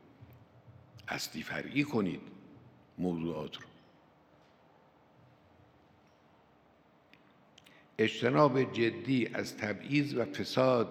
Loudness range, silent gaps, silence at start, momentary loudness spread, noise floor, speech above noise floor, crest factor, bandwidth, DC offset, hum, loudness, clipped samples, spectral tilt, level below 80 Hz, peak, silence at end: 12 LU; none; 0.2 s; 19 LU; -65 dBFS; 33 dB; 24 dB; 16 kHz; under 0.1%; none; -33 LUFS; under 0.1%; -6 dB/octave; -76 dBFS; -10 dBFS; 0 s